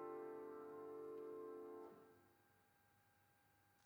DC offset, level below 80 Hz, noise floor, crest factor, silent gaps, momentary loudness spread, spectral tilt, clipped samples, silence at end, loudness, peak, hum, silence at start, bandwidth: under 0.1%; under -90 dBFS; -77 dBFS; 14 dB; none; 6 LU; -6.5 dB/octave; under 0.1%; 0 s; -55 LUFS; -42 dBFS; none; 0 s; over 20 kHz